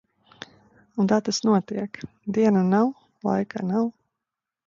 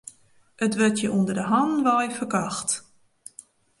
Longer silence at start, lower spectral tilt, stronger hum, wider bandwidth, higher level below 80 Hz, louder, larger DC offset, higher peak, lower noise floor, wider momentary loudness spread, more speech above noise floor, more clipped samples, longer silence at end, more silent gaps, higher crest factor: first, 0.95 s vs 0.05 s; first, -6 dB/octave vs -4.5 dB/octave; neither; second, 7.6 kHz vs 11.5 kHz; about the same, -66 dBFS vs -66 dBFS; about the same, -24 LUFS vs -24 LUFS; neither; about the same, -8 dBFS vs -8 dBFS; first, -86 dBFS vs -57 dBFS; second, 19 LU vs 22 LU; first, 64 dB vs 34 dB; neither; second, 0.75 s vs 1 s; neither; about the same, 16 dB vs 18 dB